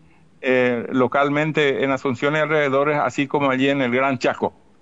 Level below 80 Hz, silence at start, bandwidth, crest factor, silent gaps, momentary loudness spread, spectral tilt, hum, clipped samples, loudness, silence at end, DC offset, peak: -64 dBFS; 0.4 s; 8 kHz; 14 dB; none; 3 LU; -6 dB/octave; none; under 0.1%; -20 LUFS; 0.3 s; 0.2%; -6 dBFS